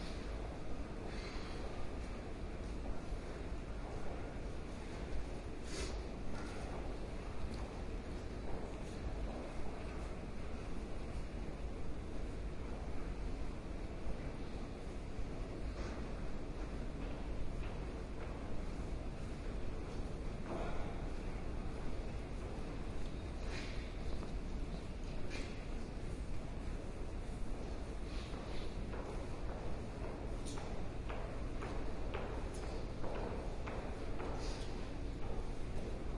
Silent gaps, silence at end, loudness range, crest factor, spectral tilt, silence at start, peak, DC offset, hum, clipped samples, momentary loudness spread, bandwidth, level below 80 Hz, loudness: none; 0 s; 2 LU; 14 dB; -6 dB/octave; 0 s; -26 dBFS; under 0.1%; none; under 0.1%; 3 LU; 11.5 kHz; -44 dBFS; -46 LUFS